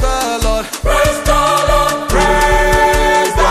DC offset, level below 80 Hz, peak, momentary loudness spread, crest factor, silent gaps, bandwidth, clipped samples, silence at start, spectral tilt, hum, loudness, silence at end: under 0.1%; -18 dBFS; -2 dBFS; 5 LU; 10 dB; none; 15.5 kHz; under 0.1%; 0 s; -3.5 dB/octave; none; -13 LUFS; 0 s